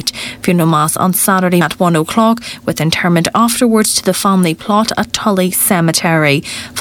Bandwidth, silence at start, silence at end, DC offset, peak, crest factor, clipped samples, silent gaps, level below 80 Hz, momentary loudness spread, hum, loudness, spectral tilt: 18.5 kHz; 0 s; 0 s; under 0.1%; 0 dBFS; 12 dB; under 0.1%; none; -46 dBFS; 5 LU; none; -12 LUFS; -4 dB/octave